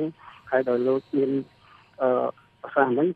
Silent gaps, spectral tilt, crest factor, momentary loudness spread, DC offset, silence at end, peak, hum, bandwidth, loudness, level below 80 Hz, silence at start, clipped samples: none; -9 dB/octave; 18 dB; 9 LU; under 0.1%; 0 s; -6 dBFS; none; 4.9 kHz; -25 LUFS; -70 dBFS; 0 s; under 0.1%